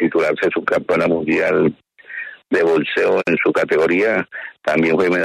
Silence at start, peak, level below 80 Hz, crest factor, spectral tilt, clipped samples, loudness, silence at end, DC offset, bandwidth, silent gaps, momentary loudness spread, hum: 0 s; -4 dBFS; -56 dBFS; 12 dB; -6.5 dB/octave; under 0.1%; -17 LUFS; 0 s; under 0.1%; 12.5 kHz; none; 11 LU; none